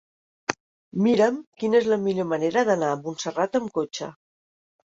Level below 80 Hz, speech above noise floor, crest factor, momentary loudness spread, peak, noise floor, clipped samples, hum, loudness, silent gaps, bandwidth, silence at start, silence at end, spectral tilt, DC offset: -68 dBFS; over 67 dB; 22 dB; 12 LU; -2 dBFS; under -90 dBFS; under 0.1%; none; -24 LUFS; 0.60-0.91 s, 1.47-1.52 s; 7.8 kHz; 0.5 s; 0.75 s; -5.5 dB/octave; under 0.1%